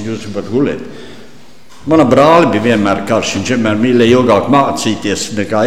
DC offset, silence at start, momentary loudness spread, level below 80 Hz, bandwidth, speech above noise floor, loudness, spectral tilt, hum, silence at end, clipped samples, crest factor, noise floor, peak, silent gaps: 2%; 0 s; 12 LU; -44 dBFS; 15 kHz; 30 dB; -11 LUFS; -5.5 dB/octave; none; 0 s; under 0.1%; 12 dB; -41 dBFS; 0 dBFS; none